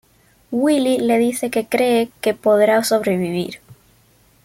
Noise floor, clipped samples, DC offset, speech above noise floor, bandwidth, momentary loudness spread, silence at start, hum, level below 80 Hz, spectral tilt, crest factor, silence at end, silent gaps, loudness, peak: -55 dBFS; under 0.1%; under 0.1%; 38 dB; 16.5 kHz; 10 LU; 0.5 s; none; -60 dBFS; -5 dB/octave; 14 dB; 0.7 s; none; -18 LUFS; -4 dBFS